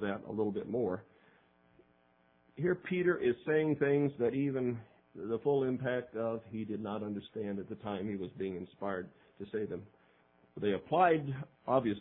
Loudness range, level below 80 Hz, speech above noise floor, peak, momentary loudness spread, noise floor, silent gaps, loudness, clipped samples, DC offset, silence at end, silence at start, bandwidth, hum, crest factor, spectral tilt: 7 LU; -72 dBFS; 35 dB; -14 dBFS; 12 LU; -69 dBFS; none; -35 LUFS; under 0.1%; under 0.1%; 0 s; 0 s; 4 kHz; none; 20 dB; -6 dB/octave